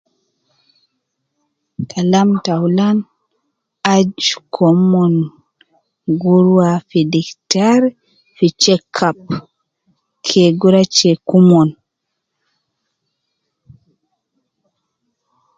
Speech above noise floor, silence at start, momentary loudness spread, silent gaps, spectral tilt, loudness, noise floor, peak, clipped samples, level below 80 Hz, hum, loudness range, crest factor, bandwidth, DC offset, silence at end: 63 dB; 1.8 s; 13 LU; none; -5.5 dB/octave; -14 LUFS; -76 dBFS; 0 dBFS; under 0.1%; -58 dBFS; none; 4 LU; 16 dB; 7.8 kHz; under 0.1%; 3.85 s